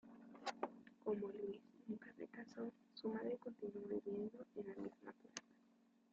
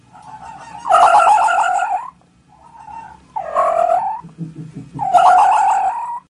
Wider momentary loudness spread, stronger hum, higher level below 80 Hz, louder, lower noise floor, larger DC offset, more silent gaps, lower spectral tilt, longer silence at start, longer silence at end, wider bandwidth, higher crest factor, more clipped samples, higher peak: second, 10 LU vs 24 LU; neither; second, -88 dBFS vs -56 dBFS; second, -50 LUFS vs -14 LUFS; first, -75 dBFS vs -50 dBFS; neither; neither; first, -5 dB/octave vs -3.5 dB/octave; second, 0.05 s vs 0.25 s; first, 0.6 s vs 0.15 s; second, 7.4 kHz vs 11 kHz; about the same, 20 dB vs 16 dB; neither; second, -30 dBFS vs 0 dBFS